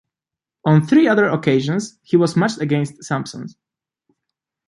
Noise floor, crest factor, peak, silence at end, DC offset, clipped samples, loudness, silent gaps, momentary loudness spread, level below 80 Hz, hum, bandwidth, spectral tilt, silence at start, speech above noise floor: -87 dBFS; 16 dB; -2 dBFS; 1.2 s; under 0.1%; under 0.1%; -17 LUFS; none; 11 LU; -62 dBFS; none; 11.5 kHz; -6.5 dB/octave; 0.65 s; 71 dB